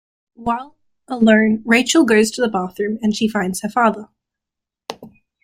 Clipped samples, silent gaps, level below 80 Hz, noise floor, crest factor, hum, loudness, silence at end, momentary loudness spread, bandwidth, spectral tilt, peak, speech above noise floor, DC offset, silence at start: under 0.1%; none; -54 dBFS; -84 dBFS; 18 dB; none; -17 LUFS; 0.35 s; 20 LU; 16 kHz; -4.5 dB/octave; 0 dBFS; 68 dB; under 0.1%; 0.4 s